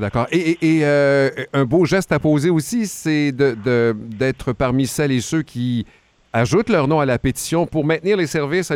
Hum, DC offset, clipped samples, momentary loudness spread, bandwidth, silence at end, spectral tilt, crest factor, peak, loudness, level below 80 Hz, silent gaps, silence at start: none; under 0.1%; under 0.1%; 6 LU; 16.5 kHz; 0 s; -6 dB/octave; 16 dB; -2 dBFS; -18 LUFS; -44 dBFS; none; 0 s